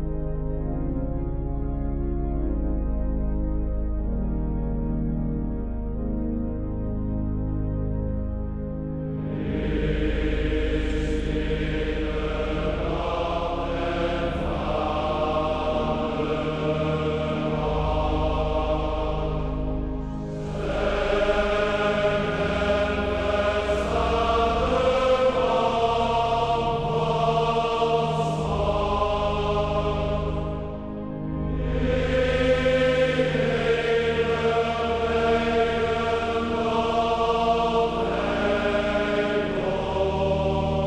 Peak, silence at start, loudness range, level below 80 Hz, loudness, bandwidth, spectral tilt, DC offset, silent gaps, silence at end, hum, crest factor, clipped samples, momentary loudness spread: -8 dBFS; 0 s; 6 LU; -32 dBFS; -25 LUFS; 9.4 kHz; -7 dB/octave; under 0.1%; none; 0 s; none; 16 dB; under 0.1%; 8 LU